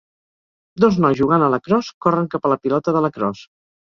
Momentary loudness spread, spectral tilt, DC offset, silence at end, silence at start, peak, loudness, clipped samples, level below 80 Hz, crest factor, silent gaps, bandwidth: 7 LU; -8 dB/octave; under 0.1%; 0.55 s; 0.75 s; -2 dBFS; -18 LUFS; under 0.1%; -54 dBFS; 18 dB; 1.94-2.01 s; 7.2 kHz